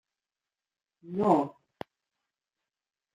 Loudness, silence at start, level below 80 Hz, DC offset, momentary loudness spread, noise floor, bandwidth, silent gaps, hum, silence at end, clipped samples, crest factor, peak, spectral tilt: -28 LUFS; 1.05 s; -78 dBFS; under 0.1%; 22 LU; under -90 dBFS; 9.6 kHz; none; none; 1.65 s; under 0.1%; 24 dB; -10 dBFS; -8.5 dB/octave